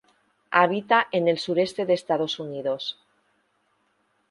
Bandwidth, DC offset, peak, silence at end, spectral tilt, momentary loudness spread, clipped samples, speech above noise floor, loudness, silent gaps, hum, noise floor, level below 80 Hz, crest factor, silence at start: 11.5 kHz; under 0.1%; -2 dBFS; 1.4 s; -5 dB/octave; 9 LU; under 0.1%; 46 dB; -24 LUFS; none; none; -69 dBFS; -74 dBFS; 22 dB; 0.5 s